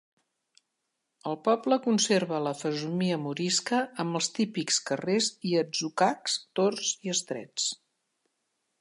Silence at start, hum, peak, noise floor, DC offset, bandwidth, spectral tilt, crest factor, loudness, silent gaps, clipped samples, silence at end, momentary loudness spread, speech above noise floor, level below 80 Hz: 1.25 s; none; -12 dBFS; -82 dBFS; under 0.1%; 11.5 kHz; -3.5 dB/octave; 18 dB; -28 LUFS; none; under 0.1%; 1.05 s; 6 LU; 53 dB; -80 dBFS